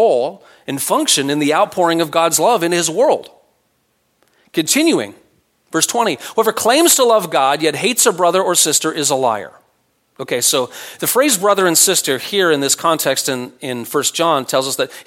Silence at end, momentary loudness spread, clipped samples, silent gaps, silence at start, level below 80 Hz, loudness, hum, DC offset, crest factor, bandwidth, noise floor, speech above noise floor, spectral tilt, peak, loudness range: 0.05 s; 10 LU; under 0.1%; none; 0 s; -68 dBFS; -15 LUFS; none; under 0.1%; 16 dB; 16.5 kHz; -63 dBFS; 48 dB; -2 dB/octave; 0 dBFS; 5 LU